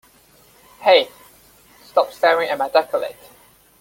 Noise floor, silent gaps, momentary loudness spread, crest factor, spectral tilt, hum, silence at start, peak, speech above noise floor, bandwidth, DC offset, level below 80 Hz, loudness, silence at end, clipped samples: -52 dBFS; none; 10 LU; 20 dB; -2.5 dB/octave; none; 0.8 s; -2 dBFS; 35 dB; 17 kHz; under 0.1%; -64 dBFS; -18 LUFS; 0.7 s; under 0.1%